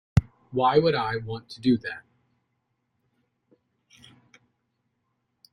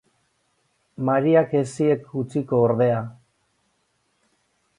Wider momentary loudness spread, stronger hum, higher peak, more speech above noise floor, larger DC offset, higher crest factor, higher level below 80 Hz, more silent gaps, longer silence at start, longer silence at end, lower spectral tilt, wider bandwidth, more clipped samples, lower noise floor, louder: first, 16 LU vs 10 LU; neither; about the same, -4 dBFS vs -6 dBFS; about the same, 52 dB vs 49 dB; neither; first, 24 dB vs 18 dB; first, -50 dBFS vs -64 dBFS; neither; second, 0.15 s vs 1 s; first, 3.55 s vs 1.65 s; about the same, -7.5 dB/octave vs -8 dB/octave; about the same, 10.5 kHz vs 11 kHz; neither; first, -76 dBFS vs -69 dBFS; second, -25 LUFS vs -21 LUFS